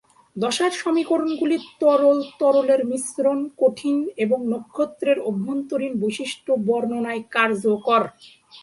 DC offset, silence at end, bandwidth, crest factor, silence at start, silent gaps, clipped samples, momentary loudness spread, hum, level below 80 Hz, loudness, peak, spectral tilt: under 0.1%; 0.05 s; 11.5 kHz; 18 dB; 0.35 s; none; under 0.1%; 7 LU; none; -70 dBFS; -22 LUFS; -4 dBFS; -4.5 dB/octave